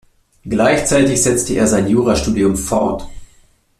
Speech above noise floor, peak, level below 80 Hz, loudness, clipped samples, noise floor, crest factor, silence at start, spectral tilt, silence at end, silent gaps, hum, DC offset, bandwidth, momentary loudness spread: 37 dB; -2 dBFS; -34 dBFS; -15 LUFS; under 0.1%; -51 dBFS; 14 dB; 0.45 s; -4.5 dB/octave; 0.55 s; none; none; under 0.1%; 14.5 kHz; 6 LU